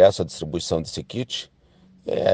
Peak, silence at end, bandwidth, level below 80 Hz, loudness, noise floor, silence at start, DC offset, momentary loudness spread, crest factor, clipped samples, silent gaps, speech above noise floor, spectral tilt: -2 dBFS; 0 s; 9.4 kHz; -50 dBFS; -26 LUFS; -55 dBFS; 0 s; under 0.1%; 10 LU; 20 dB; under 0.1%; none; 32 dB; -5 dB/octave